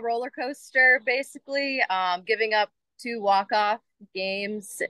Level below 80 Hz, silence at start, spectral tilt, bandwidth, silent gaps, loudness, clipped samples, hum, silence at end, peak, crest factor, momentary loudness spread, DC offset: -84 dBFS; 0 s; -2.5 dB/octave; 12.5 kHz; none; -24 LUFS; under 0.1%; none; 0 s; -8 dBFS; 18 dB; 14 LU; under 0.1%